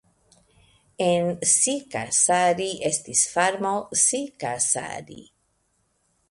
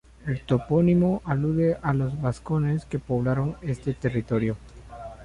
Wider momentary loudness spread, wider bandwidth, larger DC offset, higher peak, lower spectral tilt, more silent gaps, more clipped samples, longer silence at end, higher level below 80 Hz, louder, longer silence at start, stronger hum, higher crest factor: about the same, 10 LU vs 11 LU; about the same, 11.5 kHz vs 10.5 kHz; neither; first, -6 dBFS vs -10 dBFS; second, -2 dB/octave vs -9 dB/octave; neither; neither; first, 1.05 s vs 0 s; second, -64 dBFS vs -46 dBFS; first, -22 LUFS vs -25 LUFS; first, 1 s vs 0.25 s; neither; about the same, 20 dB vs 16 dB